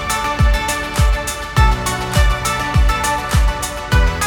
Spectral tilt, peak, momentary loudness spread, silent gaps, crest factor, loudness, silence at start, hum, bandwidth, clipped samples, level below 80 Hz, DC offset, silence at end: -4 dB/octave; -2 dBFS; 4 LU; none; 14 dB; -17 LUFS; 0 s; none; 17.5 kHz; under 0.1%; -18 dBFS; under 0.1%; 0 s